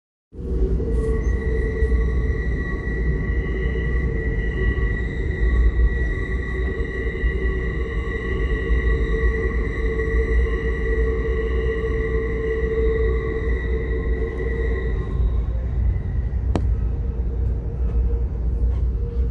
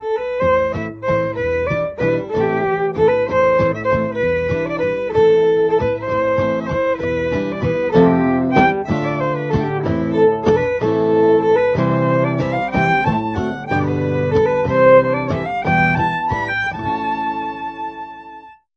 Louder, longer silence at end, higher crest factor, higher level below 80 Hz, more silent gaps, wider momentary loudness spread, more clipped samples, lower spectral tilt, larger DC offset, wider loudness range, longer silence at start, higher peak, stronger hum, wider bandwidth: second, -24 LUFS vs -17 LUFS; second, 0 s vs 0.25 s; about the same, 14 dB vs 16 dB; first, -22 dBFS vs -42 dBFS; neither; second, 4 LU vs 7 LU; neither; about the same, -8.5 dB/octave vs -8 dB/octave; neither; about the same, 2 LU vs 2 LU; first, 0.35 s vs 0 s; second, -6 dBFS vs 0 dBFS; neither; second, 4.3 kHz vs 6.8 kHz